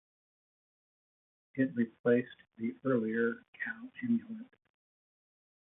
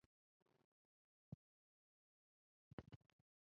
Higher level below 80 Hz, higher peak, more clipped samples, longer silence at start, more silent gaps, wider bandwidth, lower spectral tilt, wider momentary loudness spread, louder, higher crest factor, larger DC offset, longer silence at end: about the same, -82 dBFS vs -82 dBFS; first, -16 dBFS vs -38 dBFS; neither; first, 1.55 s vs 0.55 s; second, 1.99-2.04 s, 3.48-3.53 s vs 0.64-2.78 s; second, 3.8 kHz vs 4.6 kHz; first, -10.5 dB/octave vs -7 dB/octave; first, 14 LU vs 6 LU; first, -34 LUFS vs -64 LUFS; second, 20 dB vs 32 dB; neither; first, 1.15 s vs 0.45 s